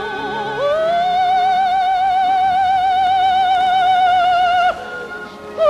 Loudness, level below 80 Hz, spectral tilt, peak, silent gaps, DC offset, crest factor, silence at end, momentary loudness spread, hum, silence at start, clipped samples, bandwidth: -15 LUFS; -50 dBFS; -3.5 dB/octave; -4 dBFS; none; under 0.1%; 12 dB; 0 s; 12 LU; none; 0 s; under 0.1%; 9.8 kHz